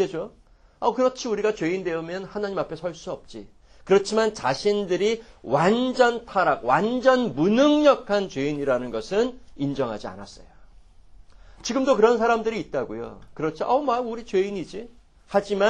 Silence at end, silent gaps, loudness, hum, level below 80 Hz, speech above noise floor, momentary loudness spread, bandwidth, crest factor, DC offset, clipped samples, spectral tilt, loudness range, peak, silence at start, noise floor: 0 s; none; -23 LUFS; none; -52 dBFS; 26 dB; 15 LU; 10 kHz; 18 dB; under 0.1%; under 0.1%; -5 dB/octave; 7 LU; -4 dBFS; 0 s; -49 dBFS